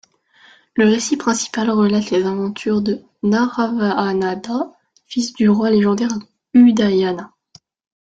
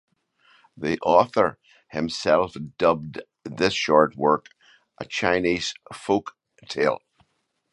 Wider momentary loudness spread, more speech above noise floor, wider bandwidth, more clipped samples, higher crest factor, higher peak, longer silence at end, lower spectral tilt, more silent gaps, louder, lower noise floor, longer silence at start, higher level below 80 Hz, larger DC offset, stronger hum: second, 11 LU vs 16 LU; second, 35 dB vs 49 dB; second, 9.2 kHz vs 11 kHz; neither; second, 16 dB vs 22 dB; about the same, -2 dBFS vs -2 dBFS; about the same, 0.8 s vs 0.75 s; about the same, -5.5 dB/octave vs -4.5 dB/octave; neither; first, -17 LUFS vs -23 LUFS; second, -51 dBFS vs -72 dBFS; about the same, 0.75 s vs 0.75 s; about the same, -58 dBFS vs -56 dBFS; neither; neither